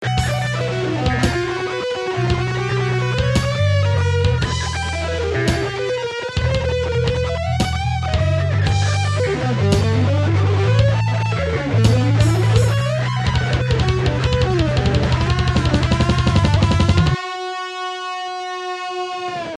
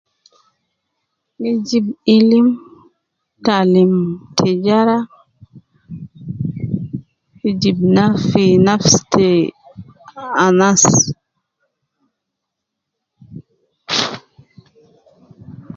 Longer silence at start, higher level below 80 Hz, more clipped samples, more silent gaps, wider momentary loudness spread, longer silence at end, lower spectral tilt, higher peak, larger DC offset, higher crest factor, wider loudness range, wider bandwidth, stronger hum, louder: second, 0 s vs 1.4 s; first, -30 dBFS vs -50 dBFS; neither; neither; second, 9 LU vs 20 LU; about the same, 0 s vs 0 s; first, -6 dB/octave vs -4.5 dB/octave; about the same, -2 dBFS vs 0 dBFS; neither; about the same, 16 dB vs 16 dB; second, 3 LU vs 13 LU; first, 12 kHz vs 7.8 kHz; neither; second, -18 LUFS vs -14 LUFS